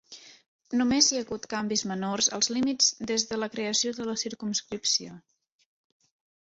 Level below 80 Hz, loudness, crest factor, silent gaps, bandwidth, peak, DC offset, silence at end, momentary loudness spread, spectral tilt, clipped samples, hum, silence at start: -66 dBFS; -26 LUFS; 22 dB; 0.48-0.59 s; 8.2 kHz; -8 dBFS; under 0.1%; 1.3 s; 10 LU; -2 dB/octave; under 0.1%; none; 0.1 s